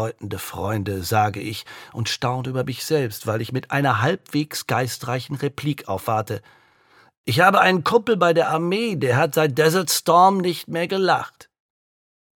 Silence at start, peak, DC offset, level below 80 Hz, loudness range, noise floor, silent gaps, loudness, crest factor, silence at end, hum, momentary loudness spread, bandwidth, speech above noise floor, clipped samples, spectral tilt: 0 s; -2 dBFS; under 0.1%; -60 dBFS; 6 LU; -56 dBFS; 7.17-7.24 s; -21 LUFS; 20 dB; 0.95 s; none; 12 LU; 17.5 kHz; 35 dB; under 0.1%; -5 dB/octave